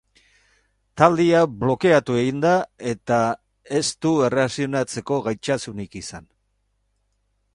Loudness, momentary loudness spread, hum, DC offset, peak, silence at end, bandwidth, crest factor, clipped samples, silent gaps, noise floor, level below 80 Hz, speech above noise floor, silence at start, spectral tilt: -21 LUFS; 15 LU; 50 Hz at -50 dBFS; under 0.1%; 0 dBFS; 1.35 s; 11.5 kHz; 22 dB; under 0.1%; none; -69 dBFS; -54 dBFS; 49 dB; 0.95 s; -5.5 dB/octave